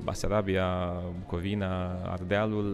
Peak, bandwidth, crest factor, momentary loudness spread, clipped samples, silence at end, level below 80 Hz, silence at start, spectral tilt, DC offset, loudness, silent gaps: -12 dBFS; 13 kHz; 16 dB; 7 LU; under 0.1%; 0 s; -44 dBFS; 0 s; -6.5 dB/octave; under 0.1%; -31 LUFS; none